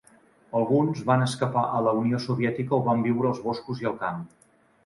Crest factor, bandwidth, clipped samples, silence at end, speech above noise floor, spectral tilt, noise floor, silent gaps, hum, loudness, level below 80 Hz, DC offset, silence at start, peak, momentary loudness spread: 18 dB; 11.5 kHz; under 0.1%; 0.6 s; 33 dB; -7 dB/octave; -58 dBFS; none; none; -25 LUFS; -64 dBFS; under 0.1%; 0.55 s; -8 dBFS; 7 LU